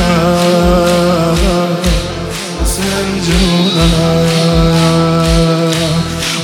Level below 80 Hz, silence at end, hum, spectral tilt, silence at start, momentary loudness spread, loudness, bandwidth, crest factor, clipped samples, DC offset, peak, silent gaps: -20 dBFS; 0 s; none; -5 dB/octave; 0 s; 5 LU; -11 LUFS; 18 kHz; 10 dB; under 0.1%; under 0.1%; 0 dBFS; none